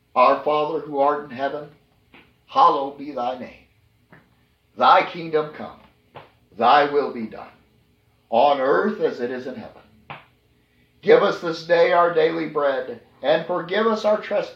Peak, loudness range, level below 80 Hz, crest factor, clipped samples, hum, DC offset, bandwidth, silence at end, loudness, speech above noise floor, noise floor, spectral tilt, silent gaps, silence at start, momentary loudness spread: -2 dBFS; 4 LU; -66 dBFS; 20 dB; under 0.1%; none; under 0.1%; 7.4 kHz; 0.05 s; -20 LUFS; 41 dB; -61 dBFS; -5.5 dB/octave; none; 0.15 s; 18 LU